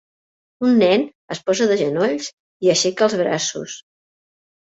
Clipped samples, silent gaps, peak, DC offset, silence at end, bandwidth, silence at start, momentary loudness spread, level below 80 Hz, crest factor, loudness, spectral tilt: under 0.1%; 1.15-1.28 s, 2.33-2.60 s; -4 dBFS; under 0.1%; 0.85 s; 8 kHz; 0.6 s; 14 LU; -64 dBFS; 16 dB; -19 LUFS; -4 dB/octave